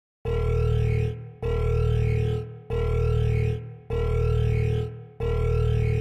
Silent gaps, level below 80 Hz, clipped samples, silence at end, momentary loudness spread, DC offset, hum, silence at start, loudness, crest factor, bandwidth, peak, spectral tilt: none; -30 dBFS; under 0.1%; 0 s; 8 LU; under 0.1%; none; 0.25 s; -26 LUFS; 10 dB; 7.2 kHz; -14 dBFS; -8.5 dB/octave